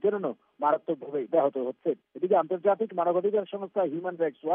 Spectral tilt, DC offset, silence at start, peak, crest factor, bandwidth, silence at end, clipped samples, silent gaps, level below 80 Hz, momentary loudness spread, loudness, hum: -6 dB/octave; under 0.1%; 0.05 s; -12 dBFS; 16 dB; 3.7 kHz; 0 s; under 0.1%; none; under -90 dBFS; 7 LU; -28 LUFS; none